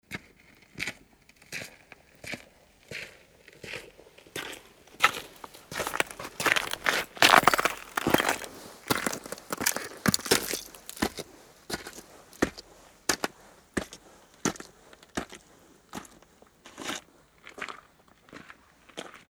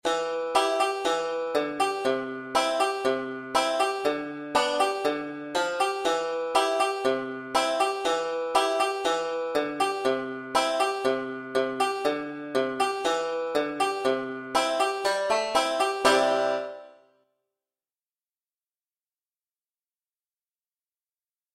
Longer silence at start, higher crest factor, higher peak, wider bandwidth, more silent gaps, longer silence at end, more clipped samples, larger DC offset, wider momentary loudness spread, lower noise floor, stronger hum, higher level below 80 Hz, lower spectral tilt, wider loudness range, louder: about the same, 0.1 s vs 0.05 s; first, 32 dB vs 20 dB; first, -2 dBFS vs -8 dBFS; first, over 20 kHz vs 16 kHz; neither; second, 0.15 s vs 4.65 s; neither; neither; first, 21 LU vs 5 LU; second, -59 dBFS vs under -90 dBFS; neither; first, -58 dBFS vs -66 dBFS; about the same, -2 dB/octave vs -2.5 dB/octave; first, 18 LU vs 2 LU; second, -29 LUFS vs -26 LUFS